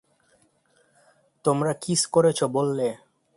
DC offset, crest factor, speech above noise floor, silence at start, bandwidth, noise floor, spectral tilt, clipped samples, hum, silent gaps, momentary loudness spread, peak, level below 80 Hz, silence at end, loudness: under 0.1%; 20 dB; 42 dB; 1.45 s; 11.5 kHz; -65 dBFS; -4.5 dB/octave; under 0.1%; none; none; 8 LU; -6 dBFS; -66 dBFS; 0.4 s; -24 LUFS